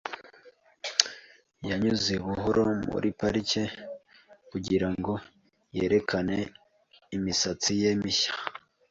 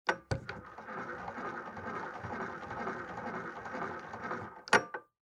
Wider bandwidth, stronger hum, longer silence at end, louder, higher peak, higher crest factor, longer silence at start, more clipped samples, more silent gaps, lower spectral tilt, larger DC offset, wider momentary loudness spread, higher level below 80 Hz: second, 7.8 kHz vs 16 kHz; neither; about the same, 0.35 s vs 0.3 s; first, -28 LUFS vs -38 LUFS; first, -2 dBFS vs -10 dBFS; about the same, 28 dB vs 28 dB; about the same, 0.05 s vs 0.05 s; neither; neither; about the same, -4 dB/octave vs -4.5 dB/octave; neither; about the same, 14 LU vs 14 LU; first, -54 dBFS vs -62 dBFS